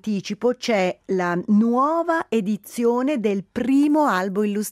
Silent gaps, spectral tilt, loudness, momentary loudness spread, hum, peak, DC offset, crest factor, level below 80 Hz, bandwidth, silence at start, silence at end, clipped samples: none; -6 dB/octave; -21 LUFS; 6 LU; none; -8 dBFS; under 0.1%; 12 dB; -64 dBFS; 15 kHz; 0.05 s; 0 s; under 0.1%